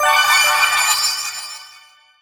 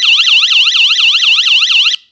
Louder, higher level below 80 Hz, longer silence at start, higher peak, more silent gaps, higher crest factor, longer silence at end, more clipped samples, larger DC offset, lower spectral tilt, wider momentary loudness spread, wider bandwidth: second, -14 LUFS vs -6 LUFS; first, -62 dBFS vs -80 dBFS; about the same, 0 s vs 0 s; about the same, -2 dBFS vs 0 dBFS; neither; first, 16 dB vs 10 dB; first, 0.55 s vs 0.15 s; neither; neither; first, 3.5 dB/octave vs 9 dB/octave; first, 18 LU vs 1 LU; first, over 20 kHz vs 9.8 kHz